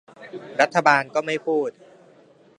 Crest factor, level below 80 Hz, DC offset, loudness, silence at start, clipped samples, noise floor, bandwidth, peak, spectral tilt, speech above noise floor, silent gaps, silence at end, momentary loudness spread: 22 dB; -76 dBFS; under 0.1%; -21 LUFS; 0.2 s; under 0.1%; -53 dBFS; 10.5 kHz; 0 dBFS; -4 dB/octave; 32 dB; none; 0.9 s; 17 LU